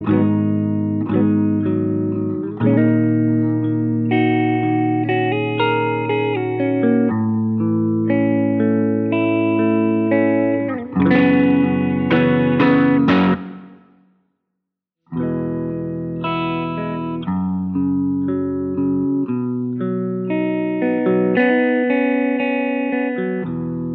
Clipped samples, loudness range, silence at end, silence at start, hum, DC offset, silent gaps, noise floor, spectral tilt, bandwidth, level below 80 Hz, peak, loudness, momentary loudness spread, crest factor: under 0.1%; 6 LU; 0 s; 0 s; none; under 0.1%; none; -79 dBFS; -7 dB/octave; 5 kHz; -56 dBFS; -2 dBFS; -18 LUFS; 8 LU; 16 dB